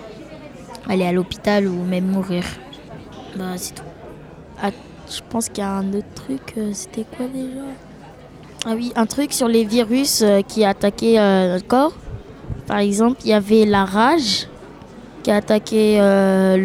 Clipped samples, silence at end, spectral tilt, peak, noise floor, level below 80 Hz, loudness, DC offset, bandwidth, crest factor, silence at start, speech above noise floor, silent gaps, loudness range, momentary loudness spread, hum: under 0.1%; 0 s; -5 dB/octave; -2 dBFS; -40 dBFS; -46 dBFS; -18 LUFS; under 0.1%; 16.5 kHz; 16 dB; 0 s; 22 dB; none; 10 LU; 23 LU; none